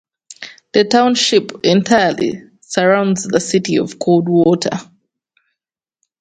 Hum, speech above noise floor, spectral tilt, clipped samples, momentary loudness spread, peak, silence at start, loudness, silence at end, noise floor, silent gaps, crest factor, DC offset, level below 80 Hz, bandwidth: none; 70 dB; -4.5 dB/octave; under 0.1%; 12 LU; 0 dBFS; 0.3 s; -14 LUFS; 1.35 s; -84 dBFS; none; 16 dB; under 0.1%; -58 dBFS; 9.4 kHz